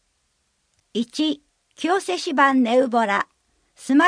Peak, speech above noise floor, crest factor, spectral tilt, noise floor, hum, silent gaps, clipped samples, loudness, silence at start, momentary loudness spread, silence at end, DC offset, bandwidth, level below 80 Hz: -4 dBFS; 50 dB; 18 dB; -3.5 dB/octave; -69 dBFS; none; none; under 0.1%; -21 LUFS; 0.95 s; 14 LU; 0 s; under 0.1%; 10.5 kHz; -72 dBFS